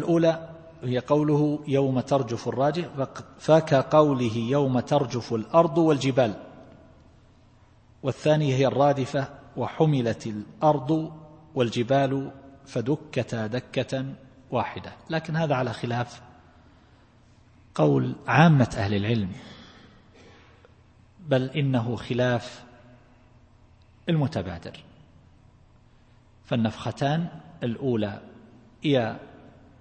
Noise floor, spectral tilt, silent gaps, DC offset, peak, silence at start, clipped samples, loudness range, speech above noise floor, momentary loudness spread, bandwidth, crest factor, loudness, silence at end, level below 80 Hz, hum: -56 dBFS; -7 dB/octave; none; under 0.1%; -4 dBFS; 0 s; under 0.1%; 8 LU; 32 dB; 14 LU; 8.8 kHz; 22 dB; -25 LUFS; 0.55 s; -58 dBFS; none